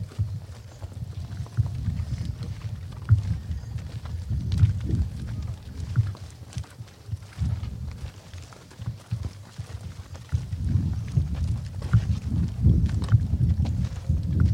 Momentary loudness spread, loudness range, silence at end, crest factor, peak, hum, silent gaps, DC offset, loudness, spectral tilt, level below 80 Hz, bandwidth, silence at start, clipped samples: 16 LU; 10 LU; 0 s; 20 dB; -6 dBFS; none; none; under 0.1%; -28 LUFS; -8 dB/octave; -34 dBFS; 10.5 kHz; 0 s; under 0.1%